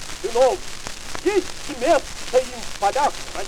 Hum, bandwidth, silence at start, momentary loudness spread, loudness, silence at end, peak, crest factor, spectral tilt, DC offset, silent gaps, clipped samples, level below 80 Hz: none; 17 kHz; 0 s; 12 LU; -22 LUFS; 0 s; -6 dBFS; 16 dB; -3 dB/octave; under 0.1%; none; under 0.1%; -40 dBFS